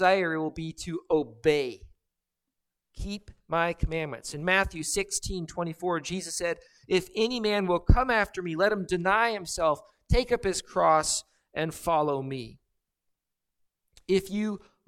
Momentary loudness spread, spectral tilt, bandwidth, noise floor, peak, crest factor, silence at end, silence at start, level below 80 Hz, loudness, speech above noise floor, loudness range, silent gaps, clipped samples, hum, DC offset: 13 LU; -4 dB/octave; 16.5 kHz; -85 dBFS; -6 dBFS; 22 dB; 0.3 s; 0 s; -38 dBFS; -28 LUFS; 58 dB; 6 LU; none; under 0.1%; none; under 0.1%